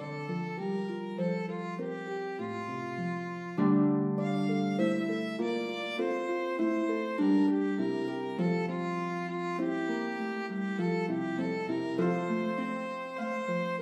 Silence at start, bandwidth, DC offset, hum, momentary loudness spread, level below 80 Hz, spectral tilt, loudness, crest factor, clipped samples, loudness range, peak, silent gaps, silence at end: 0 s; 11 kHz; under 0.1%; none; 9 LU; -82 dBFS; -7.5 dB/octave; -32 LUFS; 16 dB; under 0.1%; 3 LU; -16 dBFS; none; 0 s